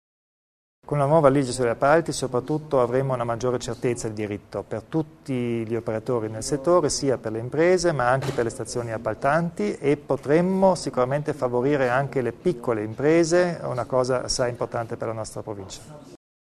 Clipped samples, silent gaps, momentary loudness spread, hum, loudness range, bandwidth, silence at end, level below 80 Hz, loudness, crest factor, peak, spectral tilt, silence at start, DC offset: under 0.1%; none; 10 LU; none; 4 LU; 13.5 kHz; 0.4 s; -52 dBFS; -24 LUFS; 22 dB; -2 dBFS; -5.5 dB/octave; 0.9 s; under 0.1%